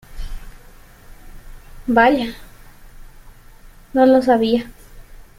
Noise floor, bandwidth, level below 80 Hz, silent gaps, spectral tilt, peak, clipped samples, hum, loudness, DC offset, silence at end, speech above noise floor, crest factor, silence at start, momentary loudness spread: -43 dBFS; 16 kHz; -38 dBFS; none; -6 dB/octave; -2 dBFS; under 0.1%; none; -16 LUFS; under 0.1%; 0.15 s; 28 dB; 18 dB; 0.1 s; 24 LU